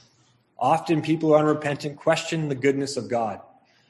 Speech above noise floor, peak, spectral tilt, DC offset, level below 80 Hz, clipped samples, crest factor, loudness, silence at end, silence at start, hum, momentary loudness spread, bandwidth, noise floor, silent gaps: 39 dB; -6 dBFS; -6 dB/octave; under 0.1%; -66 dBFS; under 0.1%; 18 dB; -24 LUFS; 0.5 s; 0.6 s; none; 8 LU; 12 kHz; -62 dBFS; none